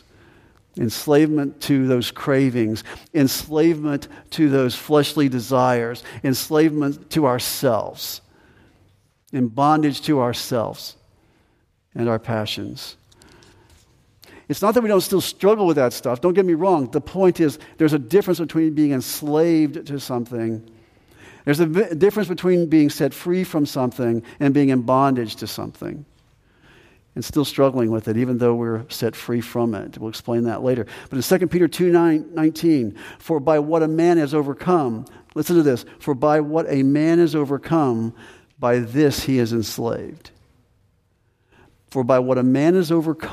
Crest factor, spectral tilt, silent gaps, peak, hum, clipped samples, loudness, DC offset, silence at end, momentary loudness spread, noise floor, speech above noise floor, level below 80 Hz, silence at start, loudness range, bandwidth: 18 dB; -6 dB/octave; none; -2 dBFS; none; under 0.1%; -20 LUFS; under 0.1%; 0 s; 12 LU; -64 dBFS; 44 dB; -56 dBFS; 0.75 s; 5 LU; 15.5 kHz